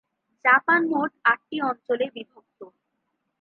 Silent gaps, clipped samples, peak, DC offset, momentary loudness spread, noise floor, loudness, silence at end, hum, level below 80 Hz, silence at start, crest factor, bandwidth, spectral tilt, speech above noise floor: none; under 0.1%; -6 dBFS; under 0.1%; 10 LU; -77 dBFS; -22 LUFS; 0.75 s; none; -84 dBFS; 0.45 s; 20 dB; 4.5 kHz; -7 dB/octave; 53 dB